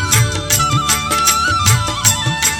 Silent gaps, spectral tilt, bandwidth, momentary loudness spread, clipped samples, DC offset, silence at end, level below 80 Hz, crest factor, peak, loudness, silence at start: none; -2 dB/octave; 19.5 kHz; 2 LU; under 0.1%; under 0.1%; 0 s; -34 dBFS; 14 dB; 0 dBFS; -13 LUFS; 0 s